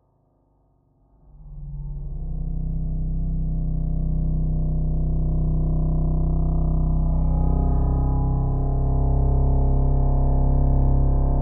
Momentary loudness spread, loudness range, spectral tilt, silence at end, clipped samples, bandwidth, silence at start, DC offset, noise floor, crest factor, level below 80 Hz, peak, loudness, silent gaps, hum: 10 LU; 8 LU; -13 dB/octave; 0 s; under 0.1%; 1.4 kHz; 1.4 s; under 0.1%; -63 dBFS; 12 dB; -22 dBFS; -8 dBFS; -24 LUFS; none; none